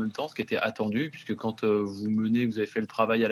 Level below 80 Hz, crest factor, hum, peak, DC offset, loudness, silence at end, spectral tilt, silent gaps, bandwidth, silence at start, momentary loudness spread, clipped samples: -70 dBFS; 20 dB; none; -8 dBFS; under 0.1%; -28 LUFS; 0 s; -7 dB/octave; none; 14 kHz; 0 s; 7 LU; under 0.1%